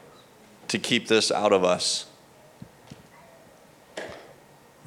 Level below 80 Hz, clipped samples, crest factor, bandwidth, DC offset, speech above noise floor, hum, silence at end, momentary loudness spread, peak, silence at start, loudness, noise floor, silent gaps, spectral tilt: -70 dBFS; under 0.1%; 22 dB; 16 kHz; under 0.1%; 30 dB; none; 0.6 s; 22 LU; -6 dBFS; 0.65 s; -23 LUFS; -53 dBFS; none; -3 dB/octave